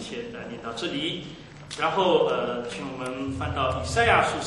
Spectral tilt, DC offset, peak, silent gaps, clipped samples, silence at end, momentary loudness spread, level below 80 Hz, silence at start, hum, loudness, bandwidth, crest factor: -4.5 dB/octave; under 0.1%; -6 dBFS; none; under 0.1%; 0 s; 15 LU; -46 dBFS; 0 s; none; -26 LUFS; 11.5 kHz; 20 dB